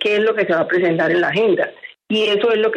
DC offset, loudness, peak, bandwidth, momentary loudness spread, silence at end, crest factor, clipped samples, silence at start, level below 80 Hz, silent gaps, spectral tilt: under 0.1%; -17 LUFS; -6 dBFS; 9 kHz; 4 LU; 0 s; 10 dB; under 0.1%; 0 s; -66 dBFS; none; -6 dB/octave